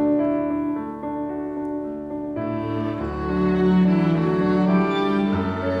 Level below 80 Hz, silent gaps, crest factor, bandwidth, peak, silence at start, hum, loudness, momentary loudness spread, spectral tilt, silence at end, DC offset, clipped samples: -44 dBFS; none; 14 dB; 5.8 kHz; -8 dBFS; 0 s; none; -22 LUFS; 10 LU; -9 dB/octave; 0 s; under 0.1%; under 0.1%